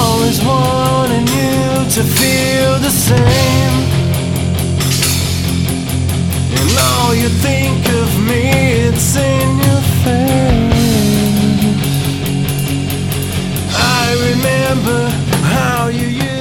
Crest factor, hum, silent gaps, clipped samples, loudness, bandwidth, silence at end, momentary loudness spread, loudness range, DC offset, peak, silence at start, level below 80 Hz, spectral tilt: 12 dB; none; none; under 0.1%; -13 LUFS; 18 kHz; 0 s; 5 LU; 2 LU; under 0.1%; 0 dBFS; 0 s; -28 dBFS; -5 dB/octave